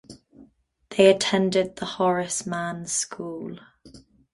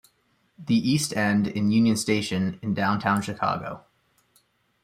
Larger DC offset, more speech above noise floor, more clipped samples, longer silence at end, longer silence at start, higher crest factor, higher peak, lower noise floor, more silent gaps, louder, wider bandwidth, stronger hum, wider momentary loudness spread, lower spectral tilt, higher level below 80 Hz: neither; second, 33 dB vs 44 dB; neither; second, 0.35 s vs 1.05 s; second, 0.1 s vs 0.6 s; about the same, 22 dB vs 18 dB; first, -4 dBFS vs -8 dBFS; second, -57 dBFS vs -68 dBFS; neither; about the same, -23 LUFS vs -24 LUFS; second, 11.5 kHz vs 15.5 kHz; neither; first, 16 LU vs 9 LU; second, -3.5 dB/octave vs -5 dB/octave; about the same, -62 dBFS vs -62 dBFS